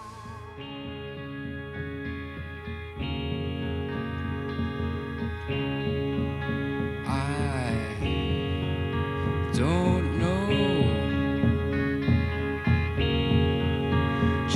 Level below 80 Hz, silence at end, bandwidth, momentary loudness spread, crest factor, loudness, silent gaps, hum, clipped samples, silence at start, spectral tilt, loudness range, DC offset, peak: -38 dBFS; 0 s; 11 kHz; 13 LU; 16 dB; -28 LUFS; none; none; under 0.1%; 0 s; -7 dB/octave; 8 LU; under 0.1%; -10 dBFS